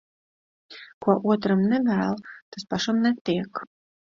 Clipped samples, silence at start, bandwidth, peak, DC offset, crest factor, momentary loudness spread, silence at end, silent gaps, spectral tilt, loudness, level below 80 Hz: under 0.1%; 0.7 s; 7.4 kHz; -8 dBFS; under 0.1%; 18 dB; 17 LU; 0.5 s; 0.93-1.01 s, 2.42-2.52 s, 3.21-3.25 s; -6.5 dB/octave; -24 LUFS; -64 dBFS